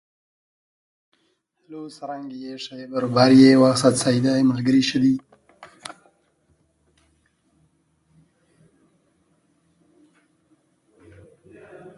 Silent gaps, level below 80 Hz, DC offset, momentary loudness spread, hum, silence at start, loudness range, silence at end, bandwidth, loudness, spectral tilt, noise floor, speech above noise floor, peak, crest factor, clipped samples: none; -64 dBFS; under 0.1%; 27 LU; none; 1.7 s; 12 LU; 6.35 s; 11.5 kHz; -17 LUFS; -5.5 dB/octave; -69 dBFS; 51 dB; -2 dBFS; 20 dB; under 0.1%